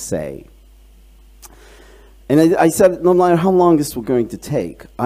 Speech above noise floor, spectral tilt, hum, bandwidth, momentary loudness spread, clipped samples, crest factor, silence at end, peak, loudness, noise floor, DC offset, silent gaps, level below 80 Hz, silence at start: 30 dB; -6.5 dB/octave; none; 16 kHz; 12 LU; under 0.1%; 16 dB; 0 s; -2 dBFS; -15 LUFS; -45 dBFS; under 0.1%; none; -44 dBFS; 0 s